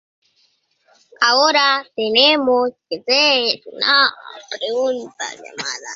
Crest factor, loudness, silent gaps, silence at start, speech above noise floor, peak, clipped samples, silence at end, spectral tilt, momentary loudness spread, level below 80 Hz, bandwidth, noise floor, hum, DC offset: 18 dB; -16 LUFS; none; 1.2 s; 45 dB; 0 dBFS; under 0.1%; 0 s; -1 dB/octave; 15 LU; -68 dBFS; 7.8 kHz; -62 dBFS; none; under 0.1%